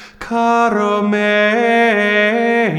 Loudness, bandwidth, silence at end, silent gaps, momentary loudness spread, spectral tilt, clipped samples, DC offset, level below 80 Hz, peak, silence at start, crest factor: -14 LUFS; 12 kHz; 0 s; none; 3 LU; -5.5 dB/octave; under 0.1%; under 0.1%; -52 dBFS; -2 dBFS; 0 s; 12 dB